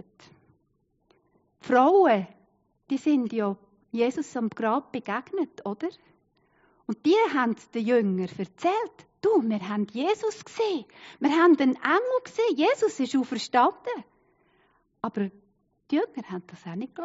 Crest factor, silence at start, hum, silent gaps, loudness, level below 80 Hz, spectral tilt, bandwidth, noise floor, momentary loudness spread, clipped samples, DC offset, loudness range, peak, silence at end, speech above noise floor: 18 dB; 1.65 s; none; none; -26 LUFS; -76 dBFS; -4 dB/octave; 8 kHz; -71 dBFS; 15 LU; under 0.1%; under 0.1%; 6 LU; -8 dBFS; 0 s; 46 dB